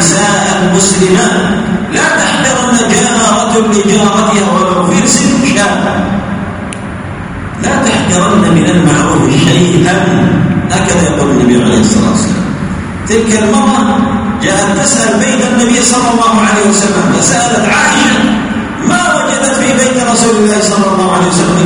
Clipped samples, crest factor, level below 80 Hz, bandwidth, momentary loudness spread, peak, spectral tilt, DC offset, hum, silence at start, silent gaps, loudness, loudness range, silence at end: 0.4%; 8 dB; -32 dBFS; 11 kHz; 6 LU; 0 dBFS; -4 dB/octave; under 0.1%; none; 0 s; none; -8 LUFS; 3 LU; 0 s